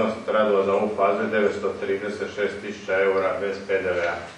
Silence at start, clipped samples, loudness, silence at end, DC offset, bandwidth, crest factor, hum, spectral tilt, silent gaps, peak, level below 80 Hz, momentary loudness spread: 0 s; under 0.1%; -24 LUFS; 0 s; under 0.1%; 10.5 kHz; 16 dB; none; -5.5 dB/octave; none; -8 dBFS; -62 dBFS; 7 LU